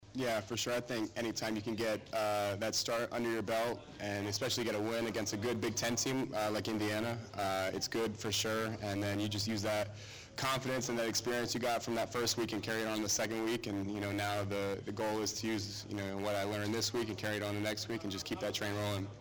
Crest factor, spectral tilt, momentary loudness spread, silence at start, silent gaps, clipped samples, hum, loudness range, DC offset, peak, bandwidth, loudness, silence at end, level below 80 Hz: 12 dB; -3.5 dB/octave; 5 LU; 0 s; none; under 0.1%; none; 2 LU; under 0.1%; -24 dBFS; over 20 kHz; -36 LUFS; 0 s; -66 dBFS